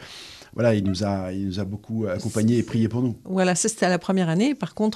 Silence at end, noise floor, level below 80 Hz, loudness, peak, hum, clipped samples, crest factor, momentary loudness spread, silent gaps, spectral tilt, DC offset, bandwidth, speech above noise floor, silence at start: 0 s; -42 dBFS; -56 dBFS; -23 LUFS; -6 dBFS; none; under 0.1%; 16 dB; 8 LU; none; -5.5 dB/octave; under 0.1%; 13.5 kHz; 20 dB; 0 s